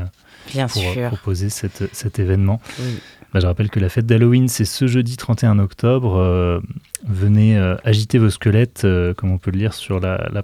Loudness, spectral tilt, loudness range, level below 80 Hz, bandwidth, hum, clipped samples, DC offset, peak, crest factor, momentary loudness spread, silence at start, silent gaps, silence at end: -18 LUFS; -6.5 dB/octave; 4 LU; -44 dBFS; 15 kHz; none; under 0.1%; under 0.1%; -2 dBFS; 16 dB; 10 LU; 0 s; none; 0 s